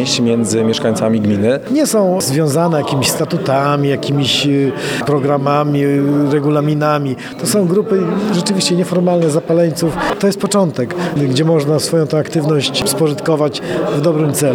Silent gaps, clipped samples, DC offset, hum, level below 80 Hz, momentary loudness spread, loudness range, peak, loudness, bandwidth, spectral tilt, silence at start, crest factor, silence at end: none; under 0.1%; under 0.1%; none; -50 dBFS; 3 LU; 1 LU; 0 dBFS; -14 LUFS; 18.5 kHz; -5 dB/octave; 0 s; 14 dB; 0 s